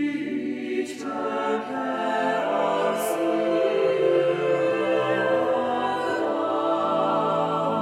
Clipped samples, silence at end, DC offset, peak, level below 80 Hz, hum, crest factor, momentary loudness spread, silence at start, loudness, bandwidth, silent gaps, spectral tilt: under 0.1%; 0 s; under 0.1%; -10 dBFS; -72 dBFS; none; 14 dB; 6 LU; 0 s; -24 LUFS; 15.5 kHz; none; -5.5 dB/octave